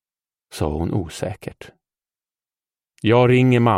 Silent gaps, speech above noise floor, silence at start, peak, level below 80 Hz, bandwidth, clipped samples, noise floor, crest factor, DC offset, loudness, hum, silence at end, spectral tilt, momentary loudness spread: none; over 72 dB; 0.55 s; -4 dBFS; -42 dBFS; 13 kHz; under 0.1%; under -90 dBFS; 18 dB; under 0.1%; -19 LUFS; none; 0 s; -7 dB/octave; 20 LU